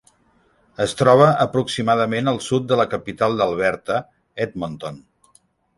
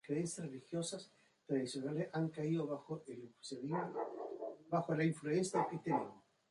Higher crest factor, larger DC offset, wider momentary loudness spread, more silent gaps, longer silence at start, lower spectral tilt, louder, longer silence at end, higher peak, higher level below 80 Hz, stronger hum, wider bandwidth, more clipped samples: about the same, 18 dB vs 18 dB; neither; first, 15 LU vs 12 LU; neither; first, 0.8 s vs 0.05 s; about the same, -5.5 dB/octave vs -6 dB/octave; first, -19 LUFS vs -40 LUFS; first, 0.8 s vs 0.3 s; first, -2 dBFS vs -22 dBFS; first, -54 dBFS vs -82 dBFS; neither; about the same, 11.5 kHz vs 11.5 kHz; neither